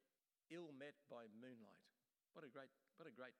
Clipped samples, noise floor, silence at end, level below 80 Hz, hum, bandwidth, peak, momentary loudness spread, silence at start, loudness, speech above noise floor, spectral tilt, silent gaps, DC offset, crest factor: under 0.1%; under -90 dBFS; 0 s; under -90 dBFS; none; 9.6 kHz; -42 dBFS; 8 LU; 0.5 s; -61 LUFS; over 28 dB; -6 dB/octave; none; under 0.1%; 20 dB